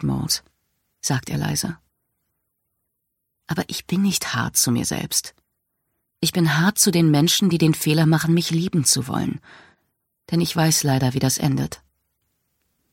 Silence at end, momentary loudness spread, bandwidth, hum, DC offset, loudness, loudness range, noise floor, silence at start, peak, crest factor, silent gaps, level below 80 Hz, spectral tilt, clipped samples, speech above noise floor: 1.15 s; 11 LU; 17 kHz; none; under 0.1%; -20 LUFS; 9 LU; -77 dBFS; 0 s; -2 dBFS; 20 dB; none; -52 dBFS; -4 dB/octave; under 0.1%; 57 dB